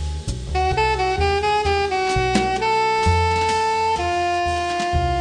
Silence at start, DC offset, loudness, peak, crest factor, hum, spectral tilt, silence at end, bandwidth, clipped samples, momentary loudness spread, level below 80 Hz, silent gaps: 0 s; under 0.1%; -20 LUFS; -6 dBFS; 14 dB; none; -5 dB/octave; 0 s; 10 kHz; under 0.1%; 4 LU; -30 dBFS; none